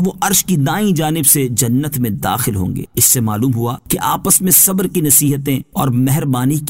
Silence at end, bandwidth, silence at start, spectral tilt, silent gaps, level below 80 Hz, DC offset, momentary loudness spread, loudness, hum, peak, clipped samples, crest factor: 0 s; 16.5 kHz; 0 s; -4 dB/octave; none; -42 dBFS; 0.2%; 9 LU; -13 LUFS; none; 0 dBFS; under 0.1%; 14 dB